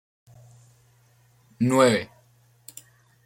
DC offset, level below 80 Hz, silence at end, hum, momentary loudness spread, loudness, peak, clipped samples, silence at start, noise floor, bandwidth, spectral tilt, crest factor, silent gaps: under 0.1%; -68 dBFS; 1.2 s; none; 25 LU; -22 LUFS; -6 dBFS; under 0.1%; 1.6 s; -60 dBFS; 16.5 kHz; -5 dB/octave; 22 dB; none